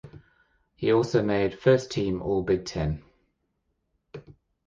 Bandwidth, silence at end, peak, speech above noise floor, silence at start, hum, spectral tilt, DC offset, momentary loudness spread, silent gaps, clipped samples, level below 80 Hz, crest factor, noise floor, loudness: 7.8 kHz; 0.35 s; -6 dBFS; 51 dB; 0.05 s; none; -6.5 dB/octave; under 0.1%; 24 LU; none; under 0.1%; -48 dBFS; 20 dB; -76 dBFS; -25 LUFS